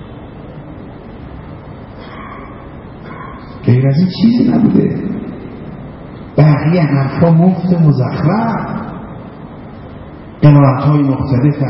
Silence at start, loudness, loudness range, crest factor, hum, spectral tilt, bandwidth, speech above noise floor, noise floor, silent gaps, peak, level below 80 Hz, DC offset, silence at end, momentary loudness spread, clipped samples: 0 s; -12 LUFS; 9 LU; 14 dB; none; -13 dB/octave; 5.8 kHz; 21 dB; -31 dBFS; none; 0 dBFS; -38 dBFS; under 0.1%; 0 s; 22 LU; under 0.1%